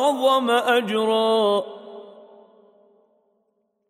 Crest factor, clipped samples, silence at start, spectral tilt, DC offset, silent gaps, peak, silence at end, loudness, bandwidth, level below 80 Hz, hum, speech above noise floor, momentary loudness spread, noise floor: 16 dB; under 0.1%; 0 s; -4 dB/octave; under 0.1%; none; -8 dBFS; 1.8 s; -20 LUFS; 15.5 kHz; -84 dBFS; none; 51 dB; 21 LU; -71 dBFS